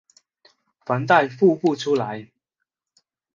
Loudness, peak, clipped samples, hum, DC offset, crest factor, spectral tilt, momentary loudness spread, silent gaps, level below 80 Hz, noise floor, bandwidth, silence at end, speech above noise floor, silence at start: -20 LUFS; -2 dBFS; under 0.1%; none; under 0.1%; 20 dB; -6.5 dB/octave; 15 LU; none; -72 dBFS; -81 dBFS; 7.4 kHz; 1.1 s; 62 dB; 0.9 s